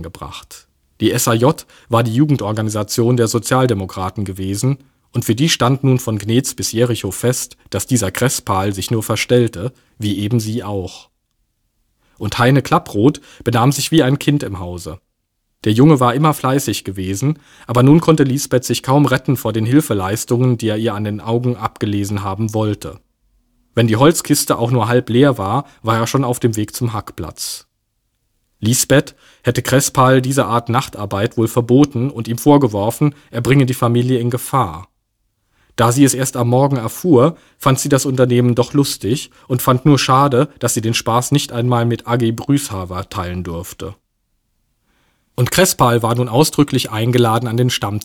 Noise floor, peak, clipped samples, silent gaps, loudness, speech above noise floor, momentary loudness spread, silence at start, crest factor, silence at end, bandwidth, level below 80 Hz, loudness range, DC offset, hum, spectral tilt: -69 dBFS; 0 dBFS; under 0.1%; none; -16 LUFS; 54 dB; 12 LU; 0 s; 16 dB; 0.05 s; 18 kHz; -48 dBFS; 5 LU; under 0.1%; none; -5.5 dB/octave